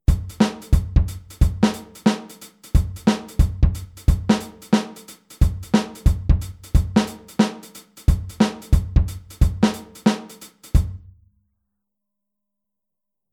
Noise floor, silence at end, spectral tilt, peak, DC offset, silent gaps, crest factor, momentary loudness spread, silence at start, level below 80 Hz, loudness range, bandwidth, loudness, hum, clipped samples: -85 dBFS; 2.35 s; -6.5 dB/octave; -2 dBFS; under 0.1%; none; 18 dB; 11 LU; 0.1 s; -24 dBFS; 3 LU; 16 kHz; -22 LUFS; none; under 0.1%